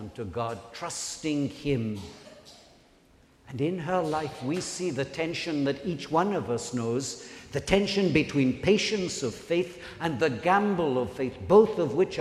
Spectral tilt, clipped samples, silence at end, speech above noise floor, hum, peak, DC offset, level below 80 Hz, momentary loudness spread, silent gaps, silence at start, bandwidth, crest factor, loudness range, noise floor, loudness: -5 dB/octave; under 0.1%; 0 s; 32 dB; none; -6 dBFS; under 0.1%; -54 dBFS; 11 LU; none; 0 s; 13.5 kHz; 22 dB; 7 LU; -59 dBFS; -28 LUFS